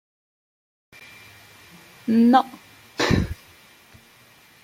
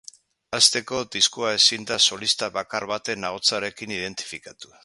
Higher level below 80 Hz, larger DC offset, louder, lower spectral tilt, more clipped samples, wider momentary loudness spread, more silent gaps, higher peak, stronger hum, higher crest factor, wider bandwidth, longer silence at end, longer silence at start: first, -44 dBFS vs -64 dBFS; neither; about the same, -21 LUFS vs -21 LUFS; first, -6 dB/octave vs -0.5 dB/octave; neither; first, 27 LU vs 13 LU; neither; about the same, -4 dBFS vs -2 dBFS; neither; about the same, 22 dB vs 24 dB; first, 16 kHz vs 11.5 kHz; first, 1.3 s vs 0.2 s; first, 2.05 s vs 0.5 s